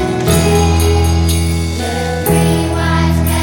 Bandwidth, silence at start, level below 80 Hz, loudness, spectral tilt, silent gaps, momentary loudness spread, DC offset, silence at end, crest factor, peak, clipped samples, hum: 19.5 kHz; 0 s; -20 dBFS; -13 LUFS; -5.5 dB/octave; none; 6 LU; under 0.1%; 0 s; 12 dB; 0 dBFS; under 0.1%; none